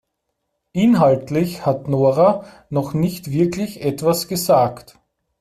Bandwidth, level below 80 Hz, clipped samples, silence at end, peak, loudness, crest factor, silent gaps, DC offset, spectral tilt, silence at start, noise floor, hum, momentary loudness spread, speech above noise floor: 16 kHz; -54 dBFS; under 0.1%; 0.6 s; -2 dBFS; -18 LUFS; 16 dB; none; under 0.1%; -6.5 dB/octave; 0.75 s; -75 dBFS; none; 9 LU; 57 dB